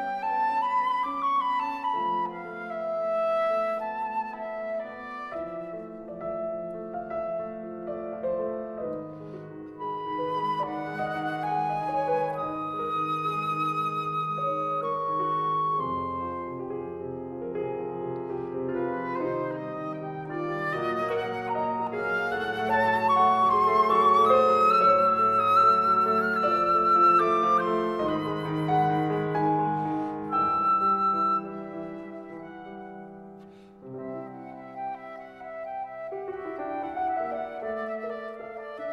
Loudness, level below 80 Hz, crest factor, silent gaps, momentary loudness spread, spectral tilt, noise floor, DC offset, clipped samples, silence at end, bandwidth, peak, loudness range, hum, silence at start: -27 LUFS; -62 dBFS; 18 dB; none; 17 LU; -7 dB/octave; -48 dBFS; under 0.1%; under 0.1%; 0 s; 13 kHz; -10 dBFS; 14 LU; none; 0 s